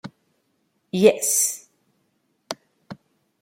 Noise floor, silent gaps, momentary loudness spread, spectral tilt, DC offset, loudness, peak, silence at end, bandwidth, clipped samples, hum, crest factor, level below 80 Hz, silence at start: -70 dBFS; none; 26 LU; -3 dB/octave; under 0.1%; -19 LUFS; -2 dBFS; 0.45 s; 16.5 kHz; under 0.1%; none; 24 dB; -70 dBFS; 0.05 s